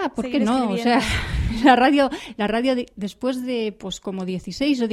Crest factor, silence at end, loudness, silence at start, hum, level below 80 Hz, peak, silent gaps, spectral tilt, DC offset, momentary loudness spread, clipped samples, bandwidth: 20 dB; 0 s; -21 LUFS; 0 s; none; -36 dBFS; -2 dBFS; none; -5.5 dB/octave; under 0.1%; 13 LU; under 0.1%; 13.5 kHz